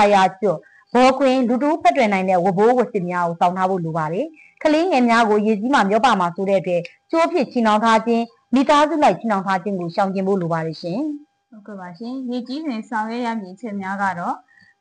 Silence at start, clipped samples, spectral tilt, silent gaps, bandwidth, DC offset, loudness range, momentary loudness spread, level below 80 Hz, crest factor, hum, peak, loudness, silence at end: 0 s; under 0.1%; -6 dB/octave; none; 10 kHz; under 0.1%; 9 LU; 12 LU; -60 dBFS; 14 dB; none; -4 dBFS; -19 LUFS; 0.45 s